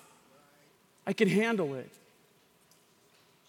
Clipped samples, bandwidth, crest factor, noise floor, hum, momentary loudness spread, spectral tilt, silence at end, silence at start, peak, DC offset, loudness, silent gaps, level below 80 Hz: under 0.1%; 17 kHz; 22 dB; -65 dBFS; none; 16 LU; -6 dB/octave; 1.6 s; 1.05 s; -12 dBFS; under 0.1%; -30 LUFS; none; -84 dBFS